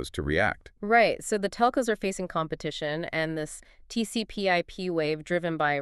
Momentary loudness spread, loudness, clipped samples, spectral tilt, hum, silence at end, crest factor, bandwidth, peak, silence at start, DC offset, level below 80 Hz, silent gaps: 9 LU; -28 LUFS; under 0.1%; -4.5 dB/octave; none; 0 s; 20 dB; 13.5 kHz; -8 dBFS; 0 s; under 0.1%; -50 dBFS; none